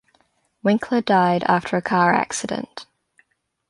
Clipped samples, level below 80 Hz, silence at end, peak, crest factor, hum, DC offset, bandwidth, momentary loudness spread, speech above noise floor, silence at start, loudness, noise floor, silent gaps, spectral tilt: under 0.1%; -62 dBFS; 0.85 s; -4 dBFS; 18 dB; none; under 0.1%; 11.5 kHz; 12 LU; 44 dB; 0.65 s; -20 LUFS; -64 dBFS; none; -5 dB/octave